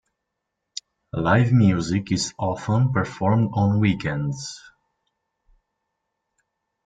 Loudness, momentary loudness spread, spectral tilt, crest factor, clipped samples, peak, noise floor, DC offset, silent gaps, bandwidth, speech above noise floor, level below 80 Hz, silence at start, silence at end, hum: -22 LUFS; 19 LU; -6.5 dB/octave; 18 dB; under 0.1%; -4 dBFS; -80 dBFS; under 0.1%; none; 9.2 kHz; 60 dB; -52 dBFS; 0.75 s; 2.25 s; none